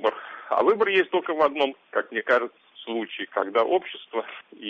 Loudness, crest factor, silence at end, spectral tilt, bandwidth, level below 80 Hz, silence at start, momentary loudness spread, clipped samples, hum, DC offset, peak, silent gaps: -25 LUFS; 18 dB; 0 s; -5.5 dB/octave; 6.8 kHz; -72 dBFS; 0 s; 11 LU; under 0.1%; none; under 0.1%; -8 dBFS; none